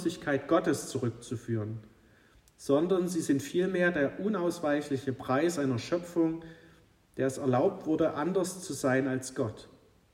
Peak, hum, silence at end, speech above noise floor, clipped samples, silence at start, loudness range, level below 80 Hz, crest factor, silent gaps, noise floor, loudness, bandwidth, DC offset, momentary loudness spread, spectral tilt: -14 dBFS; none; 0.45 s; 31 dB; under 0.1%; 0 s; 2 LU; -66 dBFS; 16 dB; none; -61 dBFS; -30 LUFS; 16 kHz; under 0.1%; 8 LU; -6 dB/octave